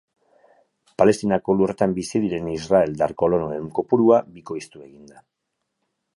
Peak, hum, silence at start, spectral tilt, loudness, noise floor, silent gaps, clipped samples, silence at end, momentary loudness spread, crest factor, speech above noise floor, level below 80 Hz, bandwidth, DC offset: -2 dBFS; none; 1 s; -6.5 dB/octave; -21 LUFS; -77 dBFS; none; under 0.1%; 1.35 s; 16 LU; 20 dB; 56 dB; -54 dBFS; 11.5 kHz; under 0.1%